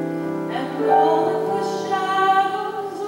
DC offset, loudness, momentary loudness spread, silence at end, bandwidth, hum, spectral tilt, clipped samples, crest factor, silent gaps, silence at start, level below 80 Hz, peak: under 0.1%; -20 LUFS; 9 LU; 0 s; 16 kHz; none; -5.5 dB/octave; under 0.1%; 16 dB; none; 0 s; -70 dBFS; -6 dBFS